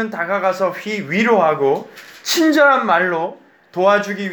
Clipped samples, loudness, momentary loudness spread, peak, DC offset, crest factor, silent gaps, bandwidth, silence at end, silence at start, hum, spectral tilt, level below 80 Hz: under 0.1%; -16 LUFS; 13 LU; 0 dBFS; under 0.1%; 16 dB; none; over 20 kHz; 0 s; 0 s; none; -4 dB/octave; -72 dBFS